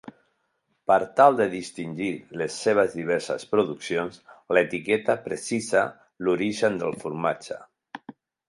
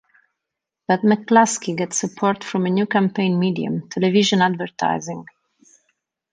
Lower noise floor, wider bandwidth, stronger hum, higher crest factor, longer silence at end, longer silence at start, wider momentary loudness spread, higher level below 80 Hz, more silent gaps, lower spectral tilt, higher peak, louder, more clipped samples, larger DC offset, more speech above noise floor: second, -74 dBFS vs -83 dBFS; first, 11.5 kHz vs 9.8 kHz; neither; about the same, 22 dB vs 18 dB; second, 0.35 s vs 1.1 s; second, 0.05 s vs 0.9 s; first, 14 LU vs 9 LU; about the same, -66 dBFS vs -66 dBFS; neither; about the same, -5 dB/octave vs -5 dB/octave; about the same, -4 dBFS vs -2 dBFS; second, -25 LUFS vs -19 LUFS; neither; neither; second, 49 dB vs 64 dB